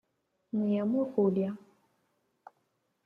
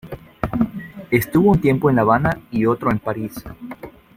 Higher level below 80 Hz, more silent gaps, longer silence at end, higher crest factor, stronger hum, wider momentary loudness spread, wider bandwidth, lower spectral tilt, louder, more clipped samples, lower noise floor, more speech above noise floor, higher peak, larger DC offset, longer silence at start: second, -76 dBFS vs -42 dBFS; neither; first, 1.5 s vs 0.3 s; about the same, 16 dB vs 18 dB; neither; second, 9 LU vs 20 LU; second, 4 kHz vs 16.5 kHz; first, -10.5 dB/octave vs -8 dB/octave; second, -30 LUFS vs -19 LUFS; neither; first, -77 dBFS vs -37 dBFS; first, 48 dB vs 20 dB; second, -16 dBFS vs -2 dBFS; neither; first, 0.55 s vs 0.05 s